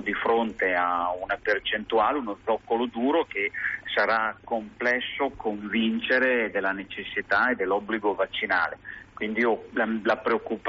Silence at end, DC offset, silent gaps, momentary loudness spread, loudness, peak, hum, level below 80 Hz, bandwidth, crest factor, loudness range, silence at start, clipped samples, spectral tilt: 0 s; under 0.1%; none; 7 LU; -26 LUFS; -12 dBFS; none; -58 dBFS; 7.4 kHz; 14 dB; 1 LU; 0 s; under 0.1%; -1.5 dB/octave